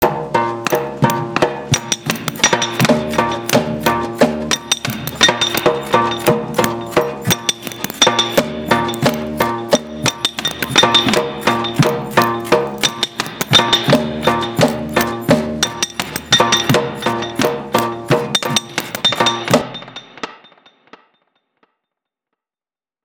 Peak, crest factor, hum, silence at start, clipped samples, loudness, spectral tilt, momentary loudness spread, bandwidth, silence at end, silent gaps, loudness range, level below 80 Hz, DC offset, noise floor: 0 dBFS; 18 dB; none; 0 s; under 0.1%; -16 LUFS; -3.5 dB/octave; 8 LU; 19 kHz; 2.65 s; none; 3 LU; -46 dBFS; under 0.1%; under -90 dBFS